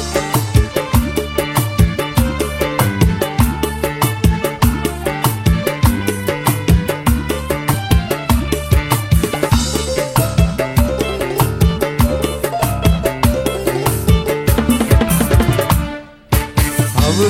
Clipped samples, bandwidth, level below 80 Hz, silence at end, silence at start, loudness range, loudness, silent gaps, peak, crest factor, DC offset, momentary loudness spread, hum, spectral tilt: under 0.1%; 16.5 kHz; -22 dBFS; 0 s; 0 s; 1 LU; -16 LUFS; none; 0 dBFS; 14 dB; under 0.1%; 4 LU; none; -5.5 dB/octave